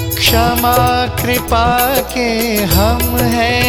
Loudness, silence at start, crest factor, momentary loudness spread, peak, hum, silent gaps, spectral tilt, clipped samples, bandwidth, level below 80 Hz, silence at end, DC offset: -13 LUFS; 0 s; 12 dB; 4 LU; 0 dBFS; none; none; -4 dB/octave; under 0.1%; over 20 kHz; -22 dBFS; 0 s; under 0.1%